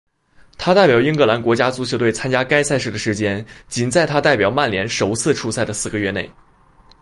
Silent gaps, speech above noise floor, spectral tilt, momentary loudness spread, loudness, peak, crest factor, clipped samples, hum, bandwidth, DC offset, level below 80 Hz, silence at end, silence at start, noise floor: none; 33 dB; -4.5 dB/octave; 9 LU; -17 LUFS; -2 dBFS; 16 dB; under 0.1%; none; 11.5 kHz; under 0.1%; -48 dBFS; 0.7 s; 0.6 s; -50 dBFS